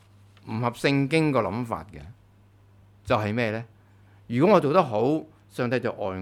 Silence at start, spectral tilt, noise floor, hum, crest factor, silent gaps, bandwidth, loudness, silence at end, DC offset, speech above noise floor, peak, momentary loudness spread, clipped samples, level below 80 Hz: 0.45 s; -7 dB/octave; -56 dBFS; 50 Hz at -55 dBFS; 20 dB; none; 15.5 kHz; -25 LUFS; 0 s; under 0.1%; 32 dB; -4 dBFS; 18 LU; under 0.1%; -58 dBFS